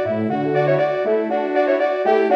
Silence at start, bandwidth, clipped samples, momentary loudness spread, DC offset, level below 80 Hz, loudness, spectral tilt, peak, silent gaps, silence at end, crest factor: 0 s; 6.4 kHz; under 0.1%; 3 LU; under 0.1%; -68 dBFS; -19 LUFS; -8 dB/octave; -4 dBFS; none; 0 s; 14 dB